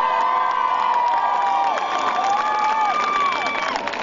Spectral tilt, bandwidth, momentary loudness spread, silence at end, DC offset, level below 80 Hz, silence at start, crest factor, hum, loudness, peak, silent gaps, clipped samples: -2 dB/octave; 7.6 kHz; 3 LU; 0 s; under 0.1%; -62 dBFS; 0 s; 14 dB; none; -20 LUFS; -6 dBFS; none; under 0.1%